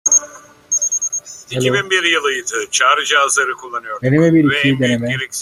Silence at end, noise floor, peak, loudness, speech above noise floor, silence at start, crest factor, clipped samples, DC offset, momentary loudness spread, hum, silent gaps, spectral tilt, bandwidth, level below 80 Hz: 0 s; -38 dBFS; -2 dBFS; -15 LUFS; 22 dB; 0.05 s; 14 dB; under 0.1%; under 0.1%; 8 LU; none; none; -3 dB/octave; 15.5 kHz; -54 dBFS